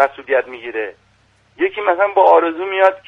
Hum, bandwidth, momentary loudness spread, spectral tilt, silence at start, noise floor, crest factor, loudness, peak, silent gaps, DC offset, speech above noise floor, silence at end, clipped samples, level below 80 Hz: none; 6.2 kHz; 14 LU; -5 dB/octave; 0 s; -56 dBFS; 16 dB; -16 LUFS; 0 dBFS; none; under 0.1%; 40 dB; 0.1 s; under 0.1%; -64 dBFS